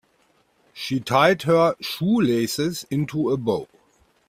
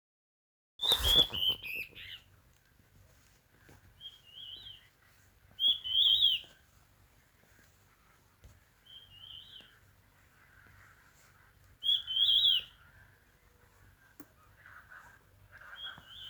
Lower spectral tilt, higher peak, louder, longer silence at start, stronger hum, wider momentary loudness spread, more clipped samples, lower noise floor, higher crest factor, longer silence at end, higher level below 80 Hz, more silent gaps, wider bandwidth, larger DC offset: first, -5.5 dB/octave vs -1 dB/octave; first, -4 dBFS vs -8 dBFS; first, -22 LUFS vs -27 LUFS; about the same, 0.75 s vs 0.8 s; neither; second, 9 LU vs 27 LU; neither; about the same, -63 dBFS vs -66 dBFS; second, 20 dB vs 28 dB; first, 0.65 s vs 0 s; about the same, -60 dBFS vs -56 dBFS; neither; second, 16 kHz vs over 20 kHz; neither